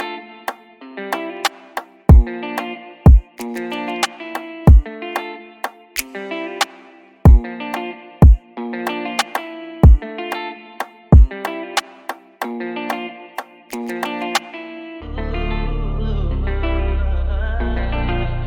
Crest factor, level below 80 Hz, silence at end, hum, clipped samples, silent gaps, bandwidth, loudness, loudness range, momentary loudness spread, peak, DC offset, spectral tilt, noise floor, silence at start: 16 dB; -18 dBFS; 0 s; none; under 0.1%; none; 17.5 kHz; -19 LUFS; 9 LU; 18 LU; 0 dBFS; under 0.1%; -6 dB/octave; -45 dBFS; 0 s